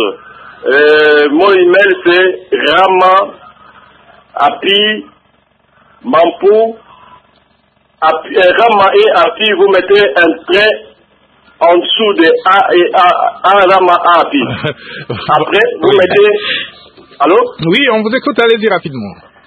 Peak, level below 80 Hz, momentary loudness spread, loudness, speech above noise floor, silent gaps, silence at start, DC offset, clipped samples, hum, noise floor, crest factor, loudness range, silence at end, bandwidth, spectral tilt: 0 dBFS; -52 dBFS; 11 LU; -9 LUFS; 44 dB; none; 0 s; under 0.1%; 0.2%; none; -53 dBFS; 10 dB; 5 LU; 0.3 s; 7.8 kHz; -6 dB/octave